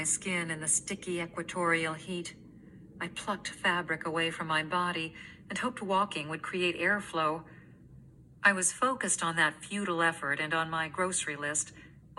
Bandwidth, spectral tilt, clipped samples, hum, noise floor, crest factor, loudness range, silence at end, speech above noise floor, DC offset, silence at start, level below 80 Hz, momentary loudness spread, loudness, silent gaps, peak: 12.5 kHz; -2.5 dB/octave; under 0.1%; none; -54 dBFS; 24 dB; 4 LU; 0.05 s; 22 dB; under 0.1%; 0 s; -66 dBFS; 10 LU; -31 LUFS; none; -10 dBFS